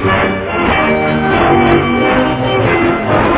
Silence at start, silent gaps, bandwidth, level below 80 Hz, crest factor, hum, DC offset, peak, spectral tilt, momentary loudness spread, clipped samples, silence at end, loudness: 0 s; none; 4 kHz; -30 dBFS; 12 dB; none; under 0.1%; 0 dBFS; -10 dB/octave; 3 LU; 0.1%; 0 s; -12 LUFS